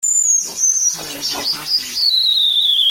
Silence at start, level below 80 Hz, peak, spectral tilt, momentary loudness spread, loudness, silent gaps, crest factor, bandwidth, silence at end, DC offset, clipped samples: 0 s; -58 dBFS; -6 dBFS; 2.5 dB/octave; 8 LU; -14 LUFS; none; 12 dB; 17 kHz; 0 s; under 0.1%; under 0.1%